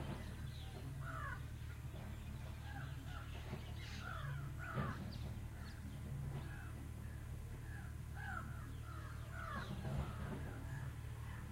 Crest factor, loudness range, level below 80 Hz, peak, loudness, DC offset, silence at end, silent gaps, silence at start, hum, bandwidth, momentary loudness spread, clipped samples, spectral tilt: 18 dB; 2 LU; -52 dBFS; -30 dBFS; -48 LUFS; under 0.1%; 0 s; none; 0 s; none; 16 kHz; 5 LU; under 0.1%; -6 dB/octave